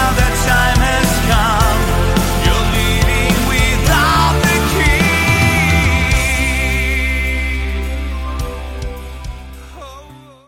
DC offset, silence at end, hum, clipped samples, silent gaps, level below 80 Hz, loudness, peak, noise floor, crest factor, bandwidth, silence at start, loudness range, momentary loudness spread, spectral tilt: under 0.1%; 0.3 s; none; under 0.1%; none; -18 dBFS; -14 LUFS; 0 dBFS; -38 dBFS; 14 dB; 16.5 kHz; 0 s; 8 LU; 16 LU; -4.5 dB/octave